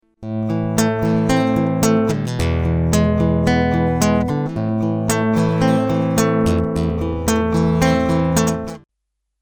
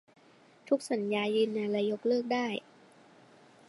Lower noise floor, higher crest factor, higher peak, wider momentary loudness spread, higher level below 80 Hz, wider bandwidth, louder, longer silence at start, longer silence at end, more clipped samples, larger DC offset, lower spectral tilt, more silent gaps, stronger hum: first, -76 dBFS vs -61 dBFS; about the same, 18 dB vs 18 dB; first, 0 dBFS vs -16 dBFS; about the same, 5 LU vs 3 LU; first, -36 dBFS vs -86 dBFS; first, over 20 kHz vs 11.5 kHz; first, -18 LUFS vs -31 LUFS; second, 0.2 s vs 0.65 s; second, 0.65 s vs 1.1 s; neither; neither; about the same, -6 dB/octave vs -5 dB/octave; neither; neither